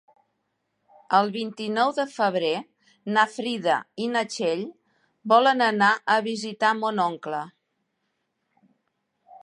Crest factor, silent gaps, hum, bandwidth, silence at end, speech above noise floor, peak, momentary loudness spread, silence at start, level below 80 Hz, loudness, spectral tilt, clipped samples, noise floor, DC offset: 22 dB; none; none; 11 kHz; 0.05 s; 53 dB; -4 dBFS; 12 LU; 1.1 s; -80 dBFS; -24 LUFS; -4 dB/octave; under 0.1%; -76 dBFS; under 0.1%